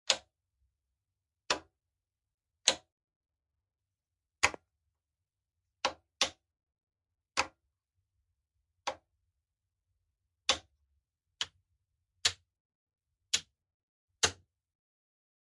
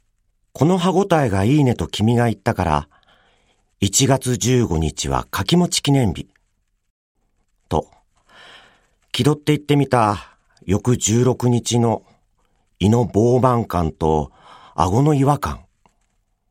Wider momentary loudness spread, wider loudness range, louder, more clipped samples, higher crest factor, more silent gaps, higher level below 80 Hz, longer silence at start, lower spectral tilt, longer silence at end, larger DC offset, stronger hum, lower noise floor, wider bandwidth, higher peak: first, 11 LU vs 8 LU; about the same, 6 LU vs 5 LU; second, -34 LUFS vs -18 LUFS; neither; first, 38 dB vs 18 dB; first, 2.34-2.38 s, 2.92-2.97 s, 3.04-3.08 s, 3.16-3.21 s, 6.83-6.87 s, 12.60-12.87 s, 13.74-14.08 s vs 6.90-7.15 s; second, -70 dBFS vs -42 dBFS; second, 0.1 s vs 0.6 s; second, 0.5 dB/octave vs -5.5 dB/octave; first, 1.1 s vs 0.9 s; neither; neither; first, under -90 dBFS vs -67 dBFS; second, 12 kHz vs 16 kHz; about the same, -2 dBFS vs -2 dBFS